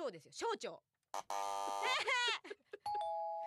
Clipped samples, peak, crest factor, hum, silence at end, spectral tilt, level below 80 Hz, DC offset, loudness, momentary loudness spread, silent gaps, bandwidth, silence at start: under 0.1%; -24 dBFS; 18 dB; none; 0 s; -0.5 dB/octave; -86 dBFS; under 0.1%; -40 LUFS; 14 LU; none; 14.5 kHz; 0 s